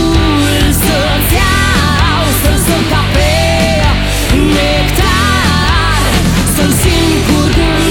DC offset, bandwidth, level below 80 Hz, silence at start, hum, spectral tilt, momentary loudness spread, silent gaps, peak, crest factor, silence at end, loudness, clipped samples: under 0.1%; 19.5 kHz; -16 dBFS; 0 s; none; -4.5 dB/octave; 1 LU; none; 0 dBFS; 10 dB; 0 s; -10 LUFS; under 0.1%